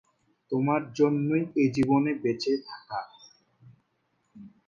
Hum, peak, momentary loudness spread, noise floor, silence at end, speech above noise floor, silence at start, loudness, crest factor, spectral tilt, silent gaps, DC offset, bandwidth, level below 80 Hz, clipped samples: none; -10 dBFS; 13 LU; -74 dBFS; 0.2 s; 48 dB; 0.5 s; -27 LUFS; 18 dB; -7 dB/octave; none; under 0.1%; 7.4 kHz; -64 dBFS; under 0.1%